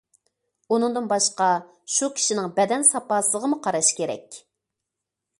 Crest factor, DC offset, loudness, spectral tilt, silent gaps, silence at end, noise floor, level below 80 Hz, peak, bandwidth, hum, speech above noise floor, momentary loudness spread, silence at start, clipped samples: 20 dB; under 0.1%; -22 LUFS; -2 dB/octave; none; 1 s; -84 dBFS; -74 dBFS; -6 dBFS; 12 kHz; none; 61 dB; 8 LU; 0.7 s; under 0.1%